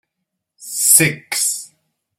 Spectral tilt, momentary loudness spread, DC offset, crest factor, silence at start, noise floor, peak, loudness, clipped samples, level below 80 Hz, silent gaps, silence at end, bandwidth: -1.5 dB/octave; 16 LU; under 0.1%; 20 dB; 0.6 s; -78 dBFS; 0 dBFS; -13 LUFS; under 0.1%; -62 dBFS; none; 0.55 s; 16.5 kHz